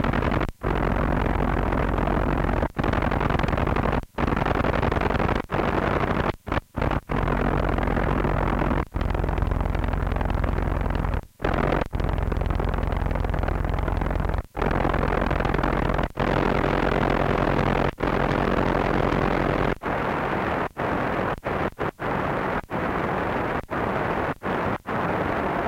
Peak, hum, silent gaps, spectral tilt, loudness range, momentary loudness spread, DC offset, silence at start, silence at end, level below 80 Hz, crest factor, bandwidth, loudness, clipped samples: -8 dBFS; none; none; -7.5 dB/octave; 3 LU; 4 LU; under 0.1%; 0 s; 0 s; -30 dBFS; 16 dB; 15.5 kHz; -25 LUFS; under 0.1%